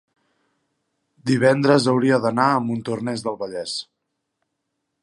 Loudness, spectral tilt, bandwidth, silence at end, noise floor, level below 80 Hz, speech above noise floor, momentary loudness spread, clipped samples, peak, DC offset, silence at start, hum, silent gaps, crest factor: -20 LUFS; -6 dB/octave; 11.5 kHz; 1.2 s; -77 dBFS; -66 dBFS; 58 dB; 12 LU; under 0.1%; -2 dBFS; under 0.1%; 1.25 s; none; none; 20 dB